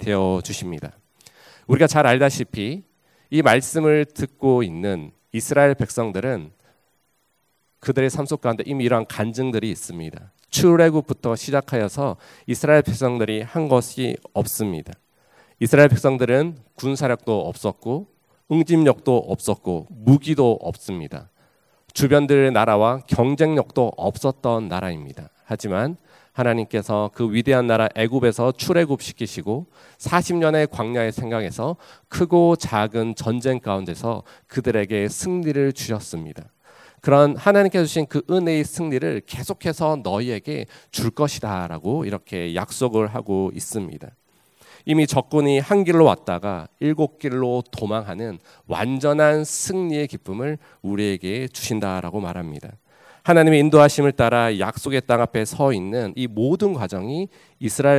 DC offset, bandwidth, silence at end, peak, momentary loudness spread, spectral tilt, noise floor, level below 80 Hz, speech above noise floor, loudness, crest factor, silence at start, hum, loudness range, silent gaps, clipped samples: under 0.1%; 16 kHz; 0 s; 0 dBFS; 14 LU; -6 dB/octave; -68 dBFS; -50 dBFS; 48 dB; -20 LUFS; 20 dB; 0 s; none; 6 LU; none; under 0.1%